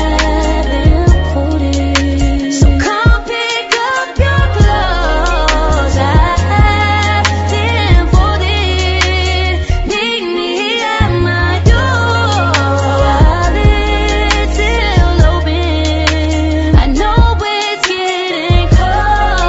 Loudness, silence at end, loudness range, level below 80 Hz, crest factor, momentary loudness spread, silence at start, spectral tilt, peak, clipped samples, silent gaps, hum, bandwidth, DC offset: -12 LUFS; 0 s; 1 LU; -14 dBFS; 10 dB; 4 LU; 0 s; -5.5 dB/octave; 0 dBFS; under 0.1%; none; none; 8 kHz; under 0.1%